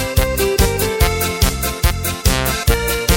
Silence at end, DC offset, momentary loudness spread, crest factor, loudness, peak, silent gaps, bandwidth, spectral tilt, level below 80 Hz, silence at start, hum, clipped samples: 0 s; under 0.1%; 2 LU; 16 dB; -17 LUFS; 0 dBFS; none; 17 kHz; -4 dB/octave; -20 dBFS; 0 s; none; under 0.1%